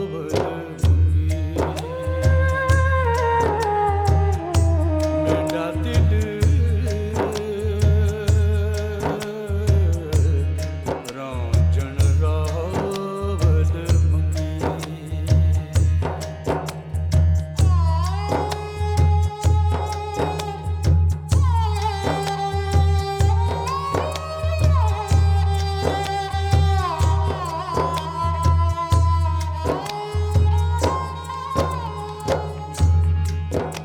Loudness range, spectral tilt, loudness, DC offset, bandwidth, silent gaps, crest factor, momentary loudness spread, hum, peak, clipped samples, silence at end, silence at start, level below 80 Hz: 2 LU; -6.5 dB/octave; -21 LUFS; under 0.1%; 11.5 kHz; none; 14 dB; 7 LU; none; -6 dBFS; under 0.1%; 0 s; 0 s; -26 dBFS